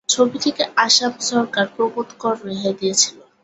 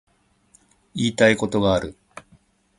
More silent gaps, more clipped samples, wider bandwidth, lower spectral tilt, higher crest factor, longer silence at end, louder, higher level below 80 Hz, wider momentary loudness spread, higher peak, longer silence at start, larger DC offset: neither; neither; second, 8.4 kHz vs 11.5 kHz; second, -2 dB/octave vs -5 dB/octave; about the same, 18 dB vs 22 dB; second, 0.25 s vs 0.85 s; about the same, -18 LUFS vs -20 LUFS; second, -66 dBFS vs -48 dBFS; second, 9 LU vs 16 LU; about the same, -2 dBFS vs -2 dBFS; second, 0.1 s vs 0.95 s; neither